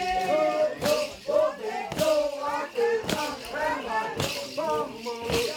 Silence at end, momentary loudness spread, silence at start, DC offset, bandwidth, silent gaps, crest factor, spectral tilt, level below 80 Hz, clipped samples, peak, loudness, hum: 0 s; 6 LU; 0 s; under 0.1%; over 20 kHz; none; 18 dB; -3.5 dB/octave; -54 dBFS; under 0.1%; -10 dBFS; -27 LUFS; none